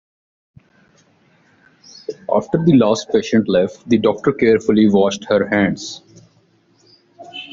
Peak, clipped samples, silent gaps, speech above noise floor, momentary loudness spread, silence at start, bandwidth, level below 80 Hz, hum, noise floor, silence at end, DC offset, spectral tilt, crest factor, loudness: -2 dBFS; under 0.1%; none; 41 dB; 18 LU; 2.1 s; 7.6 kHz; -54 dBFS; none; -56 dBFS; 0.05 s; under 0.1%; -5.5 dB/octave; 16 dB; -16 LUFS